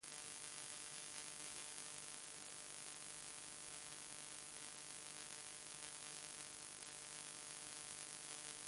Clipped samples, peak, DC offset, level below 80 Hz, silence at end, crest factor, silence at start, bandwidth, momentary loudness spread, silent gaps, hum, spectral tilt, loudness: under 0.1%; -28 dBFS; under 0.1%; -84 dBFS; 0 s; 24 dB; 0 s; 11.5 kHz; 2 LU; none; none; 0 dB/octave; -51 LUFS